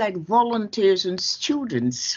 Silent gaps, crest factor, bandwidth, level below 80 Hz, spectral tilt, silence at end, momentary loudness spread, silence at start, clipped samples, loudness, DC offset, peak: none; 16 dB; 7.6 kHz; -66 dBFS; -3.5 dB/octave; 0 s; 4 LU; 0 s; under 0.1%; -22 LUFS; under 0.1%; -6 dBFS